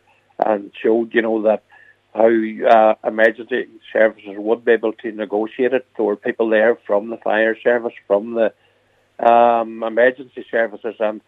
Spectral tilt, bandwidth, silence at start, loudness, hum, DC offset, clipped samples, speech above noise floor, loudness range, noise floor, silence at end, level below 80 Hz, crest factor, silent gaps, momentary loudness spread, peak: -7 dB/octave; 4.9 kHz; 0.4 s; -18 LUFS; none; under 0.1%; under 0.1%; 42 dB; 2 LU; -59 dBFS; 0.1 s; -74 dBFS; 18 dB; none; 10 LU; 0 dBFS